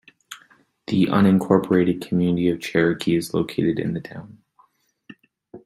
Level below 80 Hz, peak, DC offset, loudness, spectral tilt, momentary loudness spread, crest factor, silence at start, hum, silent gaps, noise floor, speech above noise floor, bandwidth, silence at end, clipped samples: -58 dBFS; -2 dBFS; under 0.1%; -21 LUFS; -7 dB/octave; 23 LU; 20 dB; 0.3 s; none; none; -60 dBFS; 40 dB; 13 kHz; 0.1 s; under 0.1%